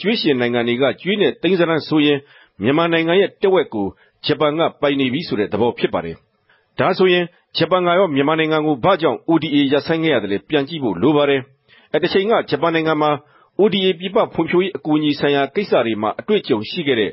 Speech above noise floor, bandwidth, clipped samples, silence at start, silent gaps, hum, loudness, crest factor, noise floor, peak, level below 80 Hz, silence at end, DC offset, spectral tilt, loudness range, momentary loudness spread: 41 dB; 5.8 kHz; under 0.1%; 0 s; none; none; -18 LUFS; 14 dB; -58 dBFS; -4 dBFS; -56 dBFS; 0 s; under 0.1%; -10.5 dB/octave; 2 LU; 6 LU